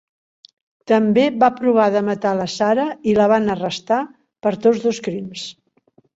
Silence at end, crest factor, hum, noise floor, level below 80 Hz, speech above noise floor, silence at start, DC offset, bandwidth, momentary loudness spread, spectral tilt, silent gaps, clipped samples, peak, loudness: 0.65 s; 16 dB; none; -58 dBFS; -58 dBFS; 41 dB; 0.9 s; under 0.1%; 8 kHz; 12 LU; -5.5 dB/octave; none; under 0.1%; -2 dBFS; -18 LUFS